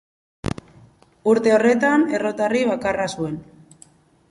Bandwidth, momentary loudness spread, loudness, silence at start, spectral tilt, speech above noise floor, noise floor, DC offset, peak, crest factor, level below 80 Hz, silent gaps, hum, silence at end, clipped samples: 11.5 kHz; 14 LU; -20 LUFS; 0.45 s; -5.5 dB/octave; 34 dB; -52 dBFS; under 0.1%; -4 dBFS; 18 dB; -50 dBFS; none; none; 0.9 s; under 0.1%